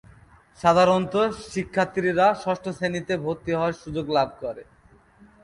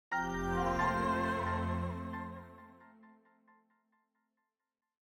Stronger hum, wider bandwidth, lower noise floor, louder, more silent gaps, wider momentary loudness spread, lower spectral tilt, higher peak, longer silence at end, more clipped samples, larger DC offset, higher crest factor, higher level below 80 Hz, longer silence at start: neither; second, 11.5 kHz vs 16.5 kHz; second, -54 dBFS vs under -90 dBFS; first, -23 LUFS vs -35 LUFS; neither; second, 12 LU vs 17 LU; about the same, -6 dB/octave vs -6.5 dB/octave; first, -6 dBFS vs -20 dBFS; second, 0.8 s vs 1.95 s; neither; neither; about the same, 18 dB vs 18 dB; about the same, -54 dBFS vs -52 dBFS; first, 0.6 s vs 0.1 s